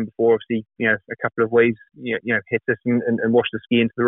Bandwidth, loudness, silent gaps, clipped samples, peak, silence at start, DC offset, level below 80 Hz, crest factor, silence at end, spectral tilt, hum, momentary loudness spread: 3.9 kHz; -21 LUFS; none; under 0.1%; -4 dBFS; 0 s; under 0.1%; -62 dBFS; 16 dB; 0 s; -4.5 dB/octave; none; 9 LU